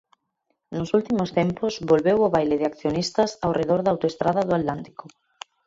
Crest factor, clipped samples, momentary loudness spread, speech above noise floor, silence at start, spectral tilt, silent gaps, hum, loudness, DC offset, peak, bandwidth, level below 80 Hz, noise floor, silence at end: 18 dB; under 0.1%; 15 LU; 52 dB; 0.7 s; -6.5 dB/octave; none; none; -23 LUFS; under 0.1%; -6 dBFS; 7.8 kHz; -54 dBFS; -75 dBFS; 0.8 s